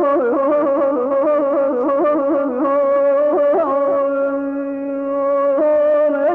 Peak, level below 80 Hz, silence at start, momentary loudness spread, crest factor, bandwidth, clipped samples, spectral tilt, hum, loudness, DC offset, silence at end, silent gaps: -8 dBFS; -58 dBFS; 0 s; 6 LU; 8 dB; 3.4 kHz; under 0.1%; -8 dB/octave; none; -16 LUFS; under 0.1%; 0 s; none